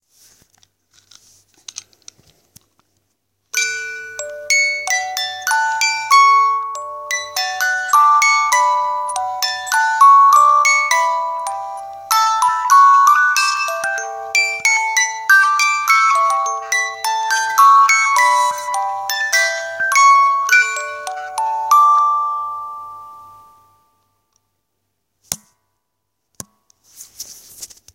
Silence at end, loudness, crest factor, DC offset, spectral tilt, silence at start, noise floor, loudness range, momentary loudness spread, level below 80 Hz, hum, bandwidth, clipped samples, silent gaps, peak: 0.3 s; -14 LUFS; 16 dB; under 0.1%; 2.5 dB/octave; 3.55 s; -74 dBFS; 16 LU; 17 LU; -70 dBFS; none; 17 kHz; under 0.1%; none; 0 dBFS